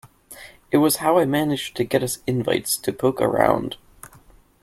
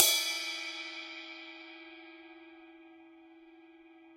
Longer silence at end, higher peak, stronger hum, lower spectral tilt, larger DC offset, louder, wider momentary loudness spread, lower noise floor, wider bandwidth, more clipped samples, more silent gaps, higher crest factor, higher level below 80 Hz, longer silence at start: first, 0.55 s vs 0 s; about the same, -2 dBFS vs -2 dBFS; neither; first, -4.5 dB/octave vs 3 dB/octave; neither; first, -21 LUFS vs -34 LUFS; second, 17 LU vs 25 LU; second, -51 dBFS vs -57 dBFS; about the same, 16.5 kHz vs 16.5 kHz; neither; neither; second, 20 dB vs 34 dB; first, -54 dBFS vs -86 dBFS; about the same, 0.05 s vs 0 s